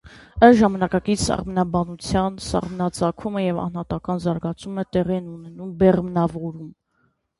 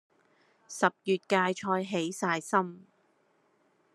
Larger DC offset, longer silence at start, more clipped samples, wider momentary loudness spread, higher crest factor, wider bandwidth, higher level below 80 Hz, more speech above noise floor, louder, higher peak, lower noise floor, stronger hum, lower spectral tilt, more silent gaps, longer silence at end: neither; second, 0.05 s vs 0.7 s; neither; first, 16 LU vs 5 LU; about the same, 20 dB vs 24 dB; about the same, 11.5 kHz vs 12.5 kHz; first, -42 dBFS vs -84 dBFS; first, 46 dB vs 40 dB; first, -21 LUFS vs -30 LUFS; first, 0 dBFS vs -8 dBFS; about the same, -67 dBFS vs -70 dBFS; neither; first, -6.5 dB/octave vs -4.5 dB/octave; neither; second, 0.7 s vs 1.15 s